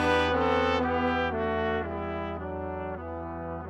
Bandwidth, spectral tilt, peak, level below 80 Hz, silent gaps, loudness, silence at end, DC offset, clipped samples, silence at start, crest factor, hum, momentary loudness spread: 11.5 kHz; -6 dB/octave; -8 dBFS; -46 dBFS; none; -29 LUFS; 0 s; under 0.1%; under 0.1%; 0 s; 20 dB; none; 11 LU